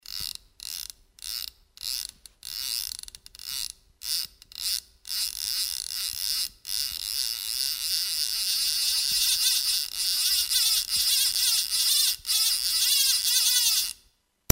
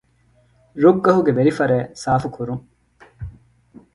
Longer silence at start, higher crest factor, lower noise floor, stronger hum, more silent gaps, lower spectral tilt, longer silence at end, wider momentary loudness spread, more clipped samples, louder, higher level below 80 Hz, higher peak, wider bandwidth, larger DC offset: second, 0.1 s vs 0.75 s; first, 26 dB vs 20 dB; first, -65 dBFS vs -58 dBFS; neither; neither; second, 2 dB/octave vs -7.5 dB/octave; about the same, 0.6 s vs 0.65 s; second, 16 LU vs 22 LU; neither; second, -24 LUFS vs -18 LUFS; second, -58 dBFS vs -48 dBFS; about the same, 0 dBFS vs 0 dBFS; first, 16.5 kHz vs 11.5 kHz; neither